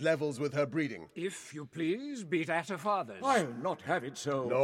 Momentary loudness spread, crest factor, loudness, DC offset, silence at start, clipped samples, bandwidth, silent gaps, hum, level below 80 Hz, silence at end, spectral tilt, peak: 9 LU; 16 dB; -34 LUFS; under 0.1%; 0 s; under 0.1%; 15.5 kHz; none; none; -80 dBFS; 0 s; -5 dB/octave; -16 dBFS